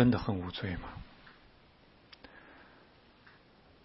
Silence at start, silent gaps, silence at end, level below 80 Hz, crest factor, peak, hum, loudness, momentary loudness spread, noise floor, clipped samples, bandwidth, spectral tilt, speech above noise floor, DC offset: 0 s; none; 1.2 s; -56 dBFS; 24 dB; -12 dBFS; none; -36 LUFS; 25 LU; -61 dBFS; under 0.1%; 5.6 kHz; -6 dB/octave; 30 dB; under 0.1%